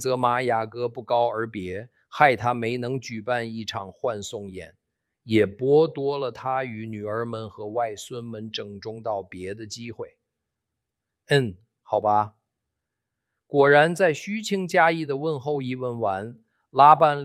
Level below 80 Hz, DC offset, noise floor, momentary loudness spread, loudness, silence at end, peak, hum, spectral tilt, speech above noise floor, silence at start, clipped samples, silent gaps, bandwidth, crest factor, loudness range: -66 dBFS; under 0.1%; -84 dBFS; 17 LU; -24 LUFS; 0 s; -2 dBFS; none; -5.5 dB/octave; 60 dB; 0 s; under 0.1%; none; 14 kHz; 22 dB; 9 LU